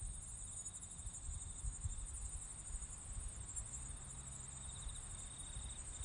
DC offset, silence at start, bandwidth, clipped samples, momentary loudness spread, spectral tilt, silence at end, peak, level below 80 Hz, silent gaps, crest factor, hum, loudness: under 0.1%; 0 s; 11 kHz; under 0.1%; 3 LU; -2.5 dB/octave; 0 s; -32 dBFS; -52 dBFS; none; 16 dB; none; -48 LUFS